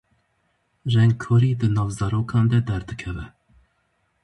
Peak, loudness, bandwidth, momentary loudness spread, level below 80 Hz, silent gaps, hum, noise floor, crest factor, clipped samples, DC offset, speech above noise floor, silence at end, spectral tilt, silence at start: -8 dBFS; -22 LUFS; 11 kHz; 14 LU; -44 dBFS; none; none; -69 dBFS; 14 dB; under 0.1%; under 0.1%; 49 dB; 0.95 s; -7.5 dB/octave; 0.85 s